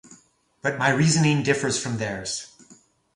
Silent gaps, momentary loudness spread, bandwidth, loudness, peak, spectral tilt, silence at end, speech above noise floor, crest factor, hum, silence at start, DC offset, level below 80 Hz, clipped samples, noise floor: none; 12 LU; 11.5 kHz; -23 LUFS; -4 dBFS; -4.5 dB/octave; 0.45 s; 36 dB; 20 dB; none; 0.1 s; under 0.1%; -58 dBFS; under 0.1%; -59 dBFS